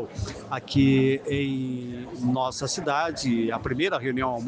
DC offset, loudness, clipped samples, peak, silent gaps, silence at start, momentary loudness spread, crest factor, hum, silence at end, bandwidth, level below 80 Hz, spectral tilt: under 0.1%; -26 LUFS; under 0.1%; -10 dBFS; none; 0 s; 13 LU; 16 dB; none; 0 s; 9.8 kHz; -48 dBFS; -5.5 dB/octave